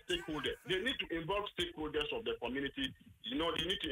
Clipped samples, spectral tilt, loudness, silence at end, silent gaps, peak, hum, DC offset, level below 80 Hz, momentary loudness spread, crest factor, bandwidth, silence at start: under 0.1%; -4 dB/octave; -38 LUFS; 0 s; none; -22 dBFS; none; under 0.1%; -58 dBFS; 5 LU; 16 dB; 16 kHz; 0.1 s